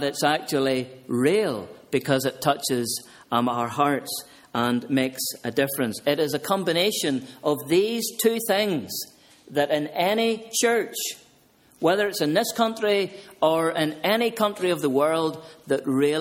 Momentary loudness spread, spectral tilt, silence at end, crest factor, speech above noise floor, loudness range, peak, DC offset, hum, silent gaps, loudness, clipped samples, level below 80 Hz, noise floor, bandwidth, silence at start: 7 LU; -4 dB/octave; 0 s; 18 dB; 34 dB; 2 LU; -6 dBFS; under 0.1%; none; none; -24 LUFS; under 0.1%; -66 dBFS; -58 dBFS; 17 kHz; 0 s